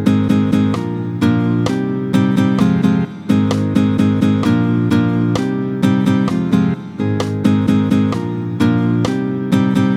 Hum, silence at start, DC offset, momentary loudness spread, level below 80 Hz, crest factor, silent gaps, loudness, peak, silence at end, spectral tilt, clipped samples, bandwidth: none; 0 s; under 0.1%; 5 LU; -48 dBFS; 14 dB; none; -16 LUFS; 0 dBFS; 0 s; -7.5 dB/octave; under 0.1%; 13.5 kHz